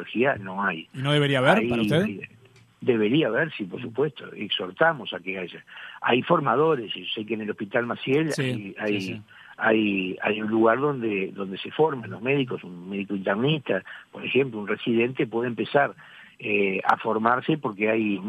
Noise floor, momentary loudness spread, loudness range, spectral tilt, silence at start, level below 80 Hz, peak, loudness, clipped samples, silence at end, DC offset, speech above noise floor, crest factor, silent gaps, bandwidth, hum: -47 dBFS; 11 LU; 3 LU; -6.5 dB/octave; 0 s; -66 dBFS; -4 dBFS; -25 LUFS; under 0.1%; 0 s; under 0.1%; 23 dB; 22 dB; none; 13.5 kHz; none